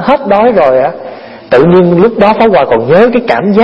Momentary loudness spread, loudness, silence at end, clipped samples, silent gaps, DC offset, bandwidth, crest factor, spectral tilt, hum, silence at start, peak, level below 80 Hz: 5 LU; -7 LUFS; 0 s; 1%; none; under 0.1%; 6.2 kHz; 6 dB; -8.5 dB/octave; none; 0 s; 0 dBFS; -40 dBFS